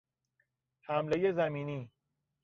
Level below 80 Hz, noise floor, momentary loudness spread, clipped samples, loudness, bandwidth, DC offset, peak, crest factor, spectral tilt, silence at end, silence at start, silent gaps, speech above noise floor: -72 dBFS; -80 dBFS; 20 LU; under 0.1%; -33 LUFS; 7 kHz; under 0.1%; -18 dBFS; 18 dB; -5.5 dB/octave; 0.55 s; 0.9 s; none; 48 dB